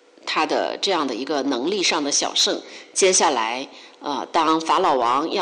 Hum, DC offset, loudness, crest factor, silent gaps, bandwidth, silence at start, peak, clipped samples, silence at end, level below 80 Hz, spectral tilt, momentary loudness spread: none; under 0.1%; -20 LUFS; 14 dB; none; 11.5 kHz; 0.25 s; -8 dBFS; under 0.1%; 0 s; -66 dBFS; -1 dB/octave; 11 LU